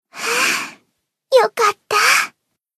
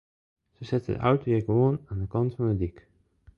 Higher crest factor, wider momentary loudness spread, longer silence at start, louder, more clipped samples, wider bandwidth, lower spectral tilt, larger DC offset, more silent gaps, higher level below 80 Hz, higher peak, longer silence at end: about the same, 18 dB vs 18 dB; about the same, 10 LU vs 8 LU; second, 0.15 s vs 0.6 s; first, -16 LUFS vs -27 LUFS; neither; first, 13.5 kHz vs 6.8 kHz; second, 0.5 dB/octave vs -10 dB/octave; neither; neither; second, -74 dBFS vs -48 dBFS; first, 0 dBFS vs -10 dBFS; about the same, 0.5 s vs 0.6 s